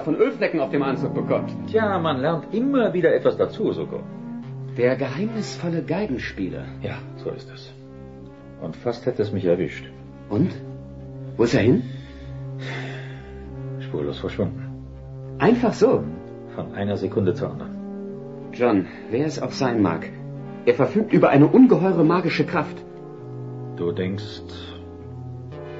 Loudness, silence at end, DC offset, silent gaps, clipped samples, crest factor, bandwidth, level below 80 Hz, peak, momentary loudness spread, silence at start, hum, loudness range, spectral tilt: -22 LUFS; 0 s; 0.1%; none; under 0.1%; 18 dB; 7.8 kHz; -50 dBFS; -4 dBFS; 19 LU; 0 s; none; 11 LU; -7.5 dB/octave